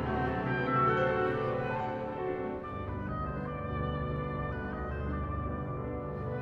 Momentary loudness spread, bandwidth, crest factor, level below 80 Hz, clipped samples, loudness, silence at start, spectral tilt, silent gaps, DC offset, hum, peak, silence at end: 9 LU; 6.4 kHz; 16 dB; -44 dBFS; under 0.1%; -34 LUFS; 0 s; -9 dB/octave; none; under 0.1%; none; -16 dBFS; 0 s